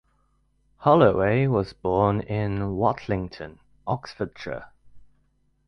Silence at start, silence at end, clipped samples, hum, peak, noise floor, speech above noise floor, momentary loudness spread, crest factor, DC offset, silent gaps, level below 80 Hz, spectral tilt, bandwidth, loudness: 0.8 s; 0.65 s; under 0.1%; none; -4 dBFS; -66 dBFS; 43 dB; 18 LU; 20 dB; under 0.1%; none; -48 dBFS; -9 dB/octave; 6.4 kHz; -24 LUFS